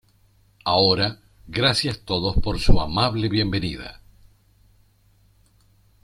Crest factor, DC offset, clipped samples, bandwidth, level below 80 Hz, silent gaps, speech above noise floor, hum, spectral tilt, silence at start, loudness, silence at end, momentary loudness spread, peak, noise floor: 20 dB; under 0.1%; under 0.1%; 12 kHz; -30 dBFS; none; 39 dB; none; -5.5 dB/octave; 0.65 s; -22 LUFS; 2.1 s; 12 LU; -2 dBFS; -59 dBFS